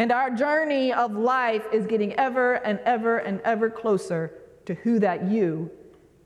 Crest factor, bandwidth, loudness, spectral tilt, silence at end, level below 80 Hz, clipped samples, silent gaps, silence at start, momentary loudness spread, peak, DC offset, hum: 16 dB; 11.5 kHz; -24 LUFS; -6.5 dB/octave; 0.4 s; -68 dBFS; under 0.1%; none; 0 s; 8 LU; -8 dBFS; under 0.1%; none